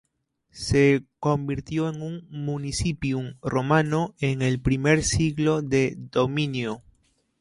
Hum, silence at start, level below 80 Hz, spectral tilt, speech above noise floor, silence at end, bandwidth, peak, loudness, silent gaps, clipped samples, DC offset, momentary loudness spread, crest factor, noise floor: none; 0.55 s; -44 dBFS; -5.5 dB/octave; 46 dB; 0.6 s; 11.5 kHz; -6 dBFS; -25 LUFS; none; under 0.1%; under 0.1%; 10 LU; 18 dB; -70 dBFS